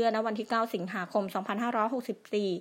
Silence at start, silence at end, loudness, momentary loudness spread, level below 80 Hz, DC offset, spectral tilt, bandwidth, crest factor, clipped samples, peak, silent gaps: 0 s; 0 s; -31 LUFS; 5 LU; -84 dBFS; under 0.1%; -6 dB/octave; 16 kHz; 16 dB; under 0.1%; -14 dBFS; none